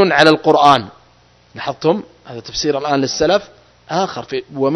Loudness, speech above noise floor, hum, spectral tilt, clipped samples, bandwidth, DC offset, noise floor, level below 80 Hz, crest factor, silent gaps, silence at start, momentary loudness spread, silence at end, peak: -16 LUFS; 35 dB; none; -4.5 dB/octave; 0.2%; 11 kHz; under 0.1%; -50 dBFS; -50 dBFS; 16 dB; none; 0 s; 15 LU; 0 s; 0 dBFS